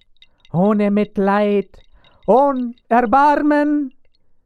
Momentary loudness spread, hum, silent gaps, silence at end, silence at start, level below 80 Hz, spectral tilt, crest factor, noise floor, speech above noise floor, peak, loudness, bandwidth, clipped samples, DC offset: 11 LU; none; none; 0.55 s; 0.55 s; -50 dBFS; -8.5 dB/octave; 16 dB; -50 dBFS; 34 dB; -2 dBFS; -16 LUFS; 9.4 kHz; under 0.1%; under 0.1%